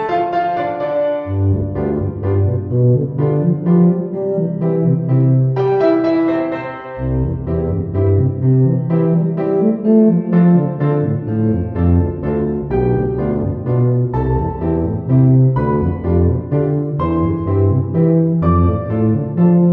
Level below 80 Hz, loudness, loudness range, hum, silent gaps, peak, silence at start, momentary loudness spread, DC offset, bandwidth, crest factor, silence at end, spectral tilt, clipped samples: -32 dBFS; -16 LUFS; 3 LU; none; none; -2 dBFS; 0 s; 6 LU; under 0.1%; 4.3 kHz; 14 dB; 0 s; -12 dB/octave; under 0.1%